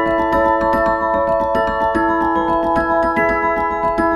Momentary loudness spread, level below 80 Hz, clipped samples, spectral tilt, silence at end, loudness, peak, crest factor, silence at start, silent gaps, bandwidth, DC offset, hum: 2 LU; -36 dBFS; under 0.1%; -7 dB/octave; 0 s; -16 LUFS; -4 dBFS; 12 dB; 0 s; none; 12.5 kHz; under 0.1%; none